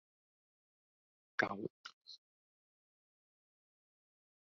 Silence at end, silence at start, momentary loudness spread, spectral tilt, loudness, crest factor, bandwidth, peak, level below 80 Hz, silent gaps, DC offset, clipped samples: 2.25 s; 1.4 s; 19 LU; -2.5 dB/octave; -41 LUFS; 32 dB; 6.6 kHz; -18 dBFS; -86 dBFS; 1.70-1.84 s, 1.93-2.01 s; under 0.1%; under 0.1%